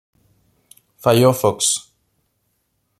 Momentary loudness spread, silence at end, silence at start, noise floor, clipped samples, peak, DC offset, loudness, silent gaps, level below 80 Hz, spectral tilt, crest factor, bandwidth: 8 LU; 1.2 s; 1.05 s; -69 dBFS; under 0.1%; -2 dBFS; under 0.1%; -17 LUFS; none; -60 dBFS; -4 dB/octave; 20 dB; 15.5 kHz